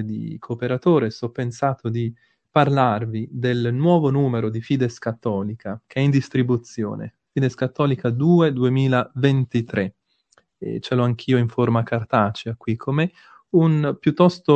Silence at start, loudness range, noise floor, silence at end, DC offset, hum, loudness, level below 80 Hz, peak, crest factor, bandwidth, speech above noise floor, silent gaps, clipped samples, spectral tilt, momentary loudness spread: 0 s; 2 LU; -62 dBFS; 0 s; under 0.1%; none; -21 LUFS; -60 dBFS; 0 dBFS; 20 dB; 8.2 kHz; 42 dB; none; under 0.1%; -8 dB/octave; 11 LU